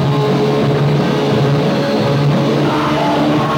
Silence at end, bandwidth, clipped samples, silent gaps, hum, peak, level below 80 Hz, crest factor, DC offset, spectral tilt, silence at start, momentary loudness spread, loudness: 0 s; 15.5 kHz; under 0.1%; none; none; -2 dBFS; -44 dBFS; 10 dB; under 0.1%; -7 dB/octave; 0 s; 1 LU; -14 LUFS